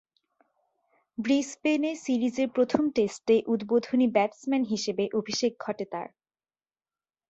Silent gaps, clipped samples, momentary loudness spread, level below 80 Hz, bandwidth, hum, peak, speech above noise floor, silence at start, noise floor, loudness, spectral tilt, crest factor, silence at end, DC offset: none; under 0.1%; 10 LU; -70 dBFS; 8.2 kHz; none; -6 dBFS; over 64 dB; 1.2 s; under -90 dBFS; -27 LUFS; -4.5 dB/octave; 22 dB; 1.25 s; under 0.1%